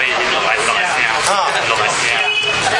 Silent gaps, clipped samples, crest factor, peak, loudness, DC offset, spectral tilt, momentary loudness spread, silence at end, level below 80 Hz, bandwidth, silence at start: none; under 0.1%; 16 dB; 0 dBFS; -14 LUFS; under 0.1%; -1 dB/octave; 1 LU; 0 s; -50 dBFS; 11.5 kHz; 0 s